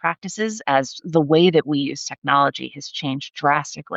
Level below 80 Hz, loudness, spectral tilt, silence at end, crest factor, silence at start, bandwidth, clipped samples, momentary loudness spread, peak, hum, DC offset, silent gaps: -70 dBFS; -20 LUFS; -5 dB/octave; 0 s; 16 dB; 0.05 s; 8.2 kHz; under 0.1%; 11 LU; -4 dBFS; none; under 0.1%; 2.18-2.22 s